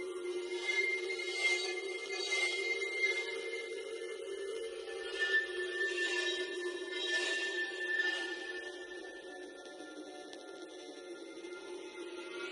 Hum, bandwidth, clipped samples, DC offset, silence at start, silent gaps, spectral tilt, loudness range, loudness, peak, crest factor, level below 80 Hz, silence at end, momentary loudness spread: none; 11.5 kHz; under 0.1%; under 0.1%; 0 s; none; 0 dB/octave; 13 LU; -36 LUFS; -22 dBFS; 16 dB; -80 dBFS; 0 s; 16 LU